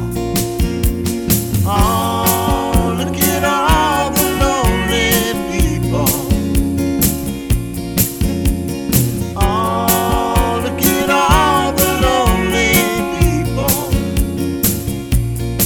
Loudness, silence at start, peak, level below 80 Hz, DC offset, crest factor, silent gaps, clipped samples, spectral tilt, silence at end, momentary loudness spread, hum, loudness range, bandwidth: -15 LUFS; 0 s; 0 dBFS; -22 dBFS; under 0.1%; 14 dB; none; under 0.1%; -4.5 dB/octave; 0 s; 6 LU; none; 3 LU; over 20 kHz